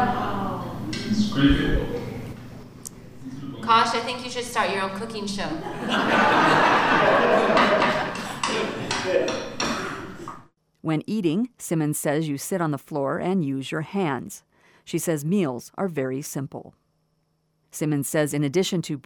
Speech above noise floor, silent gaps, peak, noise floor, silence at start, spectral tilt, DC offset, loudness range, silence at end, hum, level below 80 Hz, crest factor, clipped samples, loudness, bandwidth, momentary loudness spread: 46 dB; none; -4 dBFS; -69 dBFS; 0 s; -4.5 dB/octave; under 0.1%; 8 LU; 0.05 s; none; -42 dBFS; 20 dB; under 0.1%; -23 LUFS; 20 kHz; 18 LU